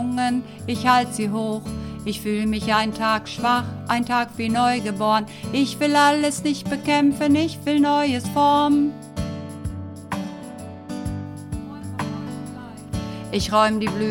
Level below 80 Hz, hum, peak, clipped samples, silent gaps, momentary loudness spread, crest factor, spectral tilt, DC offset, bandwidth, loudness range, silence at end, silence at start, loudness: -44 dBFS; none; -4 dBFS; under 0.1%; none; 14 LU; 18 dB; -5 dB/octave; under 0.1%; 17 kHz; 12 LU; 0 s; 0 s; -22 LUFS